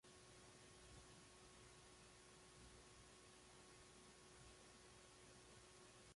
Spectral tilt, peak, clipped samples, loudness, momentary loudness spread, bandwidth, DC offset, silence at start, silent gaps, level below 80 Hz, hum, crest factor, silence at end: -3 dB/octave; -52 dBFS; under 0.1%; -65 LUFS; 1 LU; 11.5 kHz; under 0.1%; 0.05 s; none; -76 dBFS; none; 14 dB; 0 s